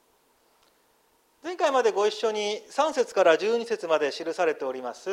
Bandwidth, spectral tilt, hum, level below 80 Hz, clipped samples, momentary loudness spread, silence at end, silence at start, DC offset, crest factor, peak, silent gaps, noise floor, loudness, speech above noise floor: 13 kHz; -2.5 dB/octave; none; -80 dBFS; under 0.1%; 11 LU; 0 s; 1.45 s; under 0.1%; 20 dB; -8 dBFS; none; -66 dBFS; -25 LUFS; 40 dB